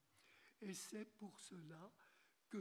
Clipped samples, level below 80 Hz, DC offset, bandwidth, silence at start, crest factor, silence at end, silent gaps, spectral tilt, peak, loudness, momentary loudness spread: under 0.1%; under -90 dBFS; under 0.1%; 18 kHz; 0.15 s; 18 dB; 0 s; none; -4 dB/octave; -38 dBFS; -56 LUFS; 11 LU